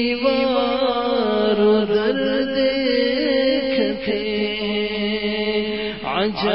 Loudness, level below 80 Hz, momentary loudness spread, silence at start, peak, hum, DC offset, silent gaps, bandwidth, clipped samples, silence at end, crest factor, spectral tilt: -20 LUFS; -48 dBFS; 5 LU; 0 s; -6 dBFS; none; 0.4%; none; 5.8 kHz; under 0.1%; 0 s; 12 dB; -9.5 dB/octave